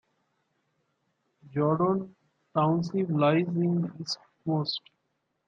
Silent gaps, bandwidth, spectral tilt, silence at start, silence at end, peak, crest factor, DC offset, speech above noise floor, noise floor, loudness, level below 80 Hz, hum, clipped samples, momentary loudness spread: none; 7.6 kHz; -7 dB/octave; 1.5 s; 0.7 s; -10 dBFS; 18 dB; under 0.1%; 51 dB; -78 dBFS; -28 LUFS; -72 dBFS; none; under 0.1%; 11 LU